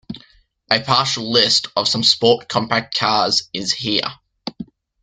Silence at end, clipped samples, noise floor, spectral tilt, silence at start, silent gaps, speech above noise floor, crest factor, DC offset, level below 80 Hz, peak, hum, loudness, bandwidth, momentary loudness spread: 0.4 s; under 0.1%; -53 dBFS; -3 dB/octave; 0.1 s; none; 35 dB; 20 dB; under 0.1%; -56 dBFS; 0 dBFS; none; -16 LUFS; 12 kHz; 19 LU